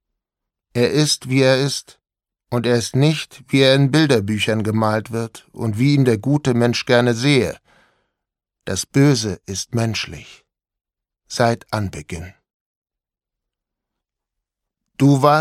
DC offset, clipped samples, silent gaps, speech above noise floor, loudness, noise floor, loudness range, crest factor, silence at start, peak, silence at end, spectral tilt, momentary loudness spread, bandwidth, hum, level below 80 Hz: under 0.1%; under 0.1%; 12.54-12.82 s; 69 dB; -18 LUFS; -86 dBFS; 9 LU; 20 dB; 0.75 s; 0 dBFS; 0 s; -5.5 dB/octave; 13 LU; 14.5 kHz; none; -52 dBFS